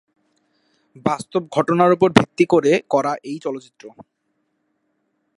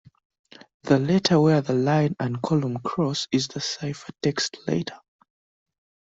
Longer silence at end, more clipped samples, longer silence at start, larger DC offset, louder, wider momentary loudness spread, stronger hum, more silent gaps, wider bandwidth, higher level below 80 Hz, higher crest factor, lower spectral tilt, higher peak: first, 1.35 s vs 1.1 s; neither; first, 1.05 s vs 0.85 s; neither; first, -18 LUFS vs -24 LUFS; first, 13 LU vs 9 LU; neither; neither; first, 11.5 kHz vs 8 kHz; about the same, -58 dBFS vs -60 dBFS; about the same, 20 dB vs 20 dB; about the same, -6 dB/octave vs -5.5 dB/octave; first, 0 dBFS vs -6 dBFS